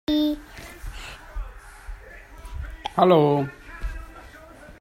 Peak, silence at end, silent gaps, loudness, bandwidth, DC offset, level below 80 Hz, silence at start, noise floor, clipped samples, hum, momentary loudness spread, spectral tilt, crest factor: -4 dBFS; 0.1 s; none; -22 LUFS; 16 kHz; under 0.1%; -38 dBFS; 0.1 s; -45 dBFS; under 0.1%; none; 26 LU; -7 dB/octave; 22 dB